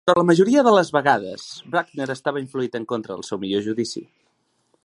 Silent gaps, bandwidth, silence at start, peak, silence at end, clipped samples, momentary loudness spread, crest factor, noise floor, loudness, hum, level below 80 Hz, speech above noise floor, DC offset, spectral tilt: none; 11.5 kHz; 0.05 s; 0 dBFS; 0.8 s; under 0.1%; 14 LU; 20 dB; -68 dBFS; -21 LUFS; none; -66 dBFS; 47 dB; under 0.1%; -5.5 dB/octave